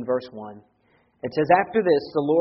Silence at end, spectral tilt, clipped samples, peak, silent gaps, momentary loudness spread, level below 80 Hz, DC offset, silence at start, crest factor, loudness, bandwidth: 0 s; -5 dB/octave; under 0.1%; -4 dBFS; none; 20 LU; -64 dBFS; under 0.1%; 0 s; 20 dB; -22 LUFS; 5.8 kHz